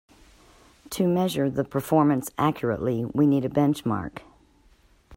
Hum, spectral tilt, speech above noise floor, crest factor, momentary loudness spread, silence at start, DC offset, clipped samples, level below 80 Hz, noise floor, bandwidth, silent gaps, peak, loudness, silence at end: none; -7 dB/octave; 35 dB; 18 dB; 9 LU; 0.9 s; under 0.1%; under 0.1%; -56 dBFS; -59 dBFS; 16 kHz; none; -8 dBFS; -24 LUFS; 0 s